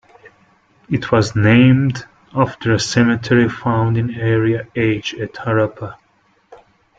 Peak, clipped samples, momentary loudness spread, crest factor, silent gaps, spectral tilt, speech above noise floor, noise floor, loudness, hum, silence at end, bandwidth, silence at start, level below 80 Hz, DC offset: -2 dBFS; under 0.1%; 12 LU; 16 dB; none; -6.5 dB/octave; 42 dB; -58 dBFS; -16 LUFS; none; 0.45 s; 7.8 kHz; 0.25 s; -48 dBFS; under 0.1%